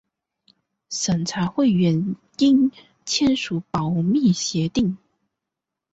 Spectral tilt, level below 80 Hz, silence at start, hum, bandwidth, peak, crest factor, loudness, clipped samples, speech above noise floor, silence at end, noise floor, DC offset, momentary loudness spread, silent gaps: -5 dB/octave; -54 dBFS; 0.9 s; none; 8 kHz; -8 dBFS; 14 dB; -21 LUFS; under 0.1%; 64 dB; 0.95 s; -84 dBFS; under 0.1%; 8 LU; none